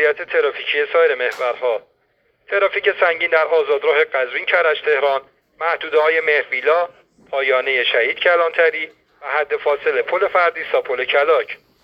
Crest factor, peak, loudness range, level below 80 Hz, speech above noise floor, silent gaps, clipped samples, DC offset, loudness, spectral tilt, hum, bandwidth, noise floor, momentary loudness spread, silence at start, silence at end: 16 dB; -2 dBFS; 1 LU; -68 dBFS; 45 dB; none; under 0.1%; under 0.1%; -17 LUFS; -3 dB/octave; none; 6.2 kHz; -63 dBFS; 7 LU; 0 s; 0.3 s